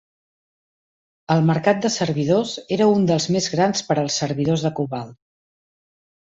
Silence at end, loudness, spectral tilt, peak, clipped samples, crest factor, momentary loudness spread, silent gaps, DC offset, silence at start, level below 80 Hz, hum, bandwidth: 1.2 s; -20 LUFS; -5.5 dB/octave; -4 dBFS; under 0.1%; 18 dB; 8 LU; none; under 0.1%; 1.3 s; -58 dBFS; none; 8 kHz